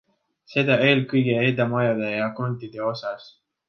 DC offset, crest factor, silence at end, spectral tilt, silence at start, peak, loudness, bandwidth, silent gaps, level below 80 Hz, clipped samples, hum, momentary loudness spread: under 0.1%; 18 dB; 0.4 s; -8 dB/octave; 0.5 s; -4 dBFS; -22 LUFS; 6.6 kHz; none; -66 dBFS; under 0.1%; none; 11 LU